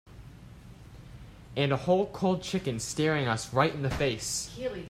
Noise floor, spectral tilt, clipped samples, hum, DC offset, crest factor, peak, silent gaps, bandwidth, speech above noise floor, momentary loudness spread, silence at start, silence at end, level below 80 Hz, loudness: -49 dBFS; -4.5 dB/octave; under 0.1%; none; under 0.1%; 22 dB; -10 dBFS; none; 16 kHz; 20 dB; 23 LU; 0.05 s; 0 s; -52 dBFS; -29 LUFS